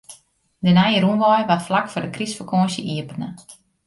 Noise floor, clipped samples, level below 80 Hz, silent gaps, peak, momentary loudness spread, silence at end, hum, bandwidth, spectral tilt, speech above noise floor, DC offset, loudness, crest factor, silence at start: -54 dBFS; under 0.1%; -58 dBFS; none; -4 dBFS; 12 LU; 0.35 s; none; 11.5 kHz; -6 dB/octave; 35 dB; under 0.1%; -19 LUFS; 16 dB; 0.1 s